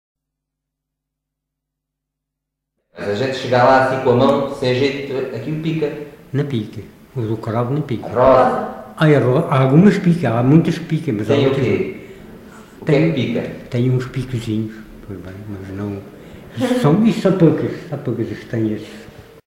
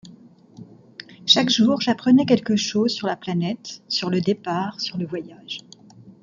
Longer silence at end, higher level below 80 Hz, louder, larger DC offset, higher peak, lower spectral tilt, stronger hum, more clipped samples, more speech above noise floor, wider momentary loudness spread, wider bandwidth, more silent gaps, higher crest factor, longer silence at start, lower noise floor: first, 0.25 s vs 0.1 s; first, -48 dBFS vs -66 dBFS; first, -17 LUFS vs -21 LUFS; neither; about the same, 0 dBFS vs -2 dBFS; first, -8 dB/octave vs -4.5 dB/octave; neither; neither; first, 63 dB vs 27 dB; about the same, 19 LU vs 17 LU; first, 15 kHz vs 7.6 kHz; neither; about the same, 18 dB vs 22 dB; first, 2.95 s vs 0.05 s; first, -80 dBFS vs -48 dBFS